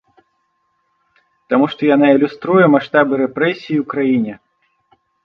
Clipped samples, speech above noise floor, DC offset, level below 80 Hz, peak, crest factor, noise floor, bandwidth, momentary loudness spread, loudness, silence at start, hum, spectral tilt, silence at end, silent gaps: under 0.1%; 52 dB; under 0.1%; -64 dBFS; 0 dBFS; 16 dB; -66 dBFS; 5.8 kHz; 7 LU; -15 LUFS; 1.5 s; none; -8.5 dB/octave; 0.9 s; none